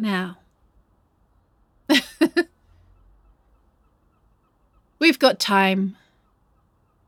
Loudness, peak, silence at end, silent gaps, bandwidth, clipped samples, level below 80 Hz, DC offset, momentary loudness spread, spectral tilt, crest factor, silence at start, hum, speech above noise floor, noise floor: -20 LUFS; -2 dBFS; 1.15 s; none; 18.5 kHz; under 0.1%; -62 dBFS; under 0.1%; 14 LU; -4.5 dB/octave; 22 dB; 0 s; none; 43 dB; -63 dBFS